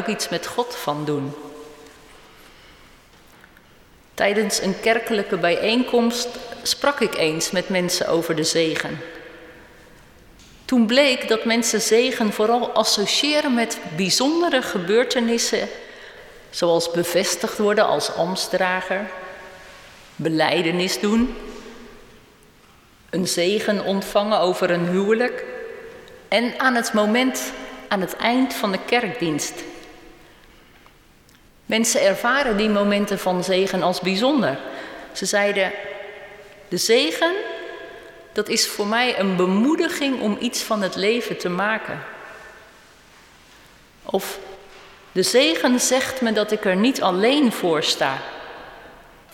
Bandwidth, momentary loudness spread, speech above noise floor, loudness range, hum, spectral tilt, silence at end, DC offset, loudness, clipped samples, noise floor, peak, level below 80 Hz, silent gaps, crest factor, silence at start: 17 kHz; 18 LU; 32 dB; 6 LU; none; -3.5 dB/octave; 0.3 s; under 0.1%; -20 LUFS; under 0.1%; -52 dBFS; -4 dBFS; -54 dBFS; none; 18 dB; 0 s